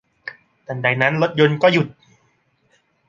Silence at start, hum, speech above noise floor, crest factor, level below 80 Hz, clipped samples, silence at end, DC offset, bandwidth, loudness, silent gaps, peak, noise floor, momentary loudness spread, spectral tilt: 0.25 s; none; 46 dB; 20 dB; -64 dBFS; under 0.1%; 1.15 s; under 0.1%; 7.4 kHz; -17 LUFS; none; 0 dBFS; -63 dBFS; 21 LU; -7 dB/octave